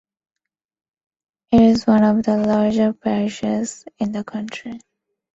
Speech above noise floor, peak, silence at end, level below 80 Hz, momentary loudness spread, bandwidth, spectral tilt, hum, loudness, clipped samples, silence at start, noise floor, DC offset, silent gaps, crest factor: 66 dB; -2 dBFS; 0.6 s; -50 dBFS; 16 LU; 8 kHz; -6.5 dB/octave; none; -18 LUFS; under 0.1%; 1.5 s; -84 dBFS; under 0.1%; none; 16 dB